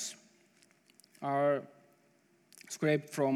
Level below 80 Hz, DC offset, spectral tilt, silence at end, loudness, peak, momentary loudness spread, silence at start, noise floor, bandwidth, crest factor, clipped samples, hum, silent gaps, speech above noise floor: under -90 dBFS; under 0.1%; -5 dB/octave; 0 s; -34 LUFS; -16 dBFS; 24 LU; 0 s; -69 dBFS; 15.5 kHz; 18 dB; under 0.1%; none; none; 38 dB